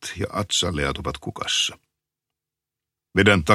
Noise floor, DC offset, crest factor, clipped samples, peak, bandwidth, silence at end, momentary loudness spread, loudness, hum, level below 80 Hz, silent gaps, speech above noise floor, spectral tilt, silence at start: -87 dBFS; under 0.1%; 22 dB; under 0.1%; -2 dBFS; 14 kHz; 0 s; 12 LU; -23 LUFS; none; -44 dBFS; none; 65 dB; -3.5 dB/octave; 0 s